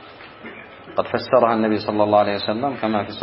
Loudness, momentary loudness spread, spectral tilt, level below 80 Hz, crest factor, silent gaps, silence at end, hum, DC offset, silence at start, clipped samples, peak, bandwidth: -20 LUFS; 20 LU; -10.5 dB/octave; -60 dBFS; 18 dB; none; 0 s; none; under 0.1%; 0 s; under 0.1%; -2 dBFS; 5.8 kHz